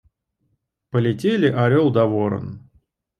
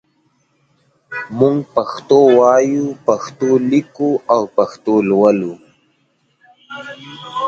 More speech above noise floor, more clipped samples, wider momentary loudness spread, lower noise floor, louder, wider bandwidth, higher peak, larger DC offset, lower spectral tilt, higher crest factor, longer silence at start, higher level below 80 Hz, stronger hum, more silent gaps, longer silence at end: first, 52 dB vs 48 dB; neither; second, 10 LU vs 20 LU; first, -71 dBFS vs -61 dBFS; second, -19 LUFS vs -14 LUFS; first, 10.5 kHz vs 7.4 kHz; second, -4 dBFS vs 0 dBFS; neither; first, -8.5 dB/octave vs -6.5 dB/octave; about the same, 16 dB vs 16 dB; second, 0.95 s vs 1.1 s; about the same, -58 dBFS vs -60 dBFS; neither; neither; first, 0.6 s vs 0 s